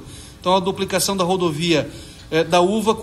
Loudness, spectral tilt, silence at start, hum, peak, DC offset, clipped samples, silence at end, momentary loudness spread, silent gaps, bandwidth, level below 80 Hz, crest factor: -19 LUFS; -4.5 dB/octave; 0 s; none; -4 dBFS; under 0.1%; under 0.1%; 0 s; 12 LU; none; 13.5 kHz; -46 dBFS; 16 dB